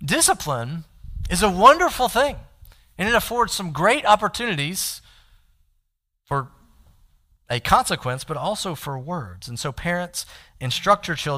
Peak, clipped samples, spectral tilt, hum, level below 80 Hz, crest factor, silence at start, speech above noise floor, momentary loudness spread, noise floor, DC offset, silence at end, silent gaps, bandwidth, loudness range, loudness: -2 dBFS; under 0.1%; -3.5 dB/octave; none; -42 dBFS; 20 dB; 0 s; 51 dB; 16 LU; -72 dBFS; under 0.1%; 0 s; none; 16 kHz; 8 LU; -21 LUFS